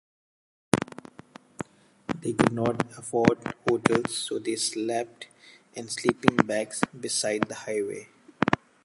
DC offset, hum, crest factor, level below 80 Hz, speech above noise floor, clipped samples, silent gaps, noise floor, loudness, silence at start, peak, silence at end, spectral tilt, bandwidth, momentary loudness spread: under 0.1%; none; 28 dB; -58 dBFS; 24 dB; under 0.1%; none; -51 dBFS; -27 LUFS; 0.75 s; 0 dBFS; 0.3 s; -4.5 dB/octave; 11.5 kHz; 17 LU